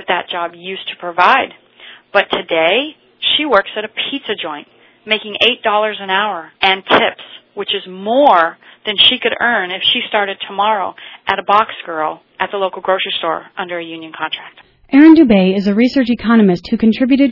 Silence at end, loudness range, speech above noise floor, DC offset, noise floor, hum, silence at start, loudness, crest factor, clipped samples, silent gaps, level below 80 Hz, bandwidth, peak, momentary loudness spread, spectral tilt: 0 s; 5 LU; 26 dB; under 0.1%; -40 dBFS; none; 0 s; -14 LUFS; 14 dB; 0.2%; none; -52 dBFS; 6 kHz; 0 dBFS; 14 LU; -6.5 dB/octave